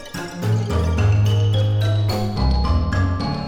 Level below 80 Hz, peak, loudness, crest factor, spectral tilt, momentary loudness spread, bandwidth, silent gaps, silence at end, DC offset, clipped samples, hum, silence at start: -26 dBFS; -8 dBFS; -20 LUFS; 12 dB; -7 dB/octave; 5 LU; 15 kHz; none; 0 s; under 0.1%; under 0.1%; none; 0 s